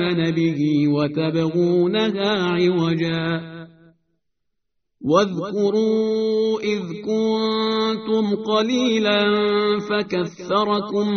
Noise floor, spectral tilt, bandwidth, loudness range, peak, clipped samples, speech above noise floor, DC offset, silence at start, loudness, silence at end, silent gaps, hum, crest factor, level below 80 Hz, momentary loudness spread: -78 dBFS; -4.5 dB/octave; 6.6 kHz; 3 LU; -4 dBFS; under 0.1%; 59 dB; under 0.1%; 0 s; -20 LUFS; 0 s; none; none; 16 dB; -60 dBFS; 6 LU